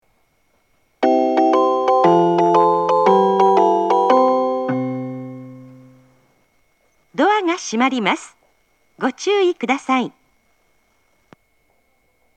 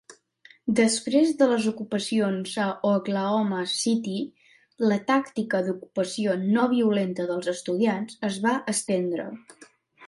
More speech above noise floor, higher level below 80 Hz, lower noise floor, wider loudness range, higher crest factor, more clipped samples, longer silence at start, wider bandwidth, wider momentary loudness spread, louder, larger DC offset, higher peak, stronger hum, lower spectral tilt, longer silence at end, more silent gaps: first, 44 dB vs 32 dB; about the same, -72 dBFS vs -72 dBFS; first, -63 dBFS vs -56 dBFS; first, 9 LU vs 2 LU; about the same, 18 dB vs 16 dB; neither; first, 1 s vs 0.1 s; second, 9.2 kHz vs 11.5 kHz; first, 12 LU vs 8 LU; first, -16 LUFS vs -25 LUFS; neither; first, 0 dBFS vs -8 dBFS; neither; about the same, -5.5 dB/octave vs -4.5 dB/octave; first, 2.3 s vs 0 s; neither